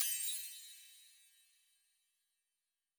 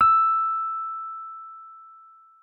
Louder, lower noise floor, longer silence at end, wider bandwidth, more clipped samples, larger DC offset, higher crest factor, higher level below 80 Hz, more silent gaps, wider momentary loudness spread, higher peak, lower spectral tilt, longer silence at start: second, -40 LUFS vs -23 LUFS; first, under -90 dBFS vs -51 dBFS; first, 1.85 s vs 0.5 s; first, over 20 kHz vs 4.2 kHz; neither; neither; first, 30 dB vs 16 dB; second, under -90 dBFS vs -66 dBFS; neither; about the same, 24 LU vs 24 LU; second, -18 dBFS vs -8 dBFS; second, 9 dB/octave vs -5 dB/octave; about the same, 0 s vs 0 s